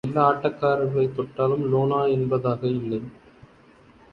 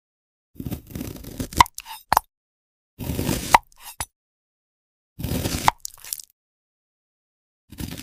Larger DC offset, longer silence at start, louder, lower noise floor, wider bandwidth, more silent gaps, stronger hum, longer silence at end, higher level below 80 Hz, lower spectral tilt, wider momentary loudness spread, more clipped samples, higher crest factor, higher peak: neither; second, 0.05 s vs 0.6 s; about the same, -23 LUFS vs -24 LUFS; second, -53 dBFS vs under -90 dBFS; second, 5.4 kHz vs 16 kHz; second, none vs 2.37-2.97 s, 4.16-5.16 s, 6.33-7.68 s; neither; first, 1 s vs 0 s; second, -58 dBFS vs -42 dBFS; first, -9.5 dB/octave vs -3.5 dB/octave; second, 7 LU vs 16 LU; neither; second, 20 dB vs 28 dB; second, -4 dBFS vs 0 dBFS